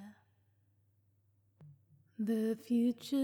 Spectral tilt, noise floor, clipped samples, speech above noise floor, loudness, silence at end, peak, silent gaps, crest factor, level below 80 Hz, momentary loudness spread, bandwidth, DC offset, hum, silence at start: -6.5 dB/octave; -73 dBFS; under 0.1%; 40 dB; -35 LUFS; 0 s; -24 dBFS; none; 14 dB; under -90 dBFS; 21 LU; 17 kHz; under 0.1%; none; 0 s